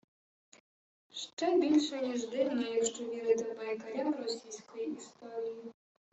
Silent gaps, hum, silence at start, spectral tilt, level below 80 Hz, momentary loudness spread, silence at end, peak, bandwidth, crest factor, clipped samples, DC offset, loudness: 1.33-1.37 s; none; 1.15 s; -3 dB/octave; -82 dBFS; 15 LU; 0.4 s; -16 dBFS; 8.2 kHz; 18 dB; under 0.1%; under 0.1%; -34 LUFS